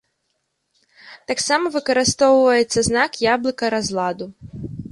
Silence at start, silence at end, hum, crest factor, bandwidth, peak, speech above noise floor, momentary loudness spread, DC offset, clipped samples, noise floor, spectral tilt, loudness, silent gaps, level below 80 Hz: 1.05 s; 0.05 s; none; 18 dB; 11.5 kHz; -2 dBFS; 54 dB; 18 LU; under 0.1%; under 0.1%; -72 dBFS; -3.5 dB/octave; -18 LUFS; none; -50 dBFS